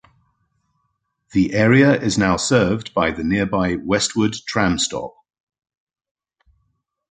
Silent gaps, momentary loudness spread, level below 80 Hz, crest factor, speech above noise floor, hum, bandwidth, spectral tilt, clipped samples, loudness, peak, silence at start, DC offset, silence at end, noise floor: none; 7 LU; -44 dBFS; 18 dB; 54 dB; none; 9.6 kHz; -5 dB/octave; under 0.1%; -18 LUFS; -2 dBFS; 1.35 s; under 0.1%; 2.05 s; -72 dBFS